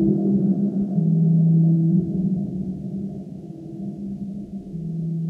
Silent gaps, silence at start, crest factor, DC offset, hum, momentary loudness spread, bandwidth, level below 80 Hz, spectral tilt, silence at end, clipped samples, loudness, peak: none; 0 s; 14 dB; under 0.1%; none; 16 LU; 0.9 kHz; -50 dBFS; -13 dB/octave; 0 s; under 0.1%; -22 LUFS; -8 dBFS